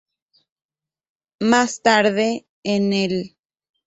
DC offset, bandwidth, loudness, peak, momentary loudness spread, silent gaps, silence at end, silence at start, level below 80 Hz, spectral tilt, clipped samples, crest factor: under 0.1%; 8.2 kHz; -19 LUFS; -2 dBFS; 11 LU; 2.49-2.63 s; 0.6 s; 1.4 s; -62 dBFS; -4.5 dB/octave; under 0.1%; 20 dB